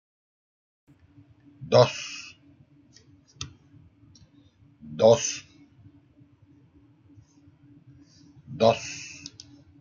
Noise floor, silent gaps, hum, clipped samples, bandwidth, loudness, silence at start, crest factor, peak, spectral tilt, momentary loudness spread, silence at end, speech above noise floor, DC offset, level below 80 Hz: -58 dBFS; none; none; under 0.1%; 7.6 kHz; -23 LUFS; 1.6 s; 26 dB; -4 dBFS; -4.5 dB/octave; 24 LU; 0.55 s; 36 dB; under 0.1%; -66 dBFS